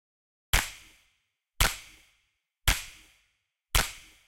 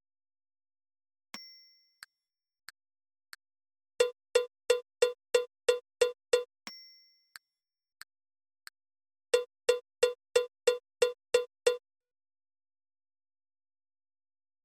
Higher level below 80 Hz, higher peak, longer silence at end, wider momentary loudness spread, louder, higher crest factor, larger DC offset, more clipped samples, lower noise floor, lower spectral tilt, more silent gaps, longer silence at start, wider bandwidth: first, -36 dBFS vs -76 dBFS; first, -8 dBFS vs -12 dBFS; second, 0.3 s vs 2.85 s; second, 14 LU vs 18 LU; about the same, -29 LUFS vs -31 LUFS; about the same, 26 dB vs 22 dB; neither; neither; second, -76 dBFS vs under -90 dBFS; first, -1.5 dB/octave vs 0.5 dB/octave; neither; second, 0.55 s vs 1.35 s; first, 17 kHz vs 14 kHz